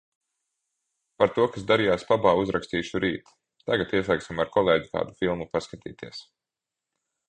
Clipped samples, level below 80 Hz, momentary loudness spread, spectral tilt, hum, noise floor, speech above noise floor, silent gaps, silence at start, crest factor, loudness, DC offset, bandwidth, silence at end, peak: under 0.1%; -54 dBFS; 17 LU; -6 dB/octave; none; -88 dBFS; 63 dB; none; 1.2 s; 22 dB; -25 LUFS; under 0.1%; 9.6 kHz; 1.1 s; -4 dBFS